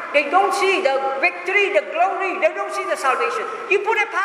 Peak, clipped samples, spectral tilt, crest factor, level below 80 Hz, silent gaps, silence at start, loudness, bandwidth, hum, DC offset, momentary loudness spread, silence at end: -2 dBFS; under 0.1%; -1.5 dB/octave; 18 dB; -76 dBFS; none; 0 s; -19 LUFS; 14 kHz; none; under 0.1%; 5 LU; 0 s